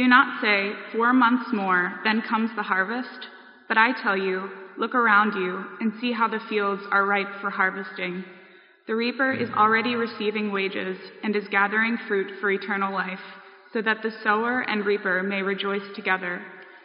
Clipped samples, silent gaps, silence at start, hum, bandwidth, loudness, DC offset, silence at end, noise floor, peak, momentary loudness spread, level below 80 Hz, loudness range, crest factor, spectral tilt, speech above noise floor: under 0.1%; none; 0 s; none; 5.4 kHz; -24 LUFS; under 0.1%; 0.05 s; -51 dBFS; -2 dBFS; 12 LU; -84 dBFS; 3 LU; 22 dB; -2.5 dB/octave; 27 dB